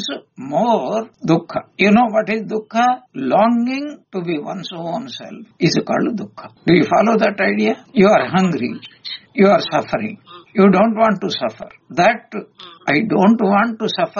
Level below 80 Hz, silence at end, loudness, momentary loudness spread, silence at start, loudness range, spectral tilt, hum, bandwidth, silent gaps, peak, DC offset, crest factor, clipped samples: -58 dBFS; 0 s; -17 LUFS; 14 LU; 0 s; 4 LU; -4.5 dB/octave; none; 7.2 kHz; none; -2 dBFS; under 0.1%; 16 dB; under 0.1%